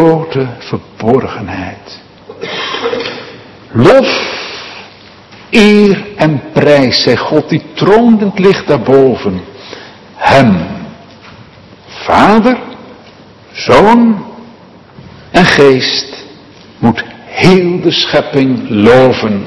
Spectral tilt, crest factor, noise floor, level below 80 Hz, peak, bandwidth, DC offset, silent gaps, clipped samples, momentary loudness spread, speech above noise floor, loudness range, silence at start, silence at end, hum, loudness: -6 dB/octave; 10 dB; -36 dBFS; -40 dBFS; 0 dBFS; 12 kHz; under 0.1%; none; 3%; 20 LU; 28 dB; 4 LU; 0 s; 0 s; none; -9 LUFS